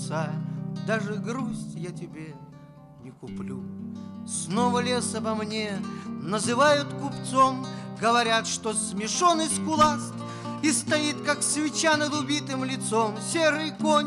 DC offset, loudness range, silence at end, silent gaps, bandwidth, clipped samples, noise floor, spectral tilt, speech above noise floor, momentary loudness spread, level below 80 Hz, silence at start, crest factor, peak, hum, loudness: under 0.1%; 10 LU; 0 s; none; 15.5 kHz; under 0.1%; -47 dBFS; -3.5 dB/octave; 21 dB; 14 LU; -62 dBFS; 0 s; 16 dB; -10 dBFS; none; -26 LUFS